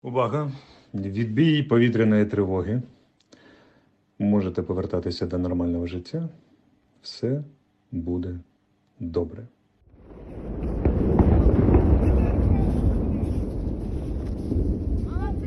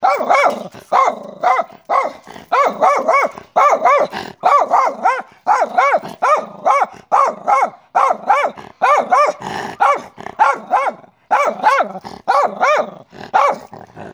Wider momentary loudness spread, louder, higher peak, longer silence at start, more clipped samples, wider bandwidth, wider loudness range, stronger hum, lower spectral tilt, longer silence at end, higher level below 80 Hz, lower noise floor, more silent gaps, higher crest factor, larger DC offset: first, 17 LU vs 9 LU; second, -24 LUFS vs -15 LUFS; second, -6 dBFS vs 0 dBFS; about the same, 0.05 s vs 0 s; neither; second, 7.8 kHz vs over 20 kHz; first, 11 LU vs 2 LU; neither; first, -9 dB/octave vs -3 dB/octave; about the same, 0 s vs 0 s; first, -30 dBFS vs -64 dBFS; first, -65 dBFS vs -35 dBFS; neither; about the same, 18 dB vs 16 dB; neither